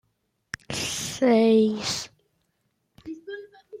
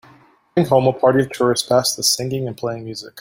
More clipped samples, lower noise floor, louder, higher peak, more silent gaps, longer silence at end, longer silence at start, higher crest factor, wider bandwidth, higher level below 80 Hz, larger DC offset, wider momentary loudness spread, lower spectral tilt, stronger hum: neither; first, -74 dBFS vs -50 dBFS; second, -23 LUFS vs -18 LUFS; second, -10 dBFS vs -2 dBFS; neither; about the same, 0 s vs 0 s; first, 0.7 s vs 0.55 s; about the same, 16 dB vs 18 dB; about the same, 15.5 kHz vs 16.5 kHz; second, -62 dBFS vs -56 dBFS; neither; first, 22 LU vs 11 LU; about the same, -4 dB/octave vs -4 dB/octave; neither